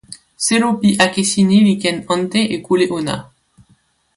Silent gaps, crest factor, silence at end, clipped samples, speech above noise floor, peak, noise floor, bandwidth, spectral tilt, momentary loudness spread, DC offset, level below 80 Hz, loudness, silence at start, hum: none; 16 dB; 0.95 s; under 0.1%; 42 dB; 0 dBFS; -57 dBFS; 11.5 kHz; -4.5 dB/octave; 8 LU; under 0.1%; -54 dBFS; -15 LUFS; 0.1 s; none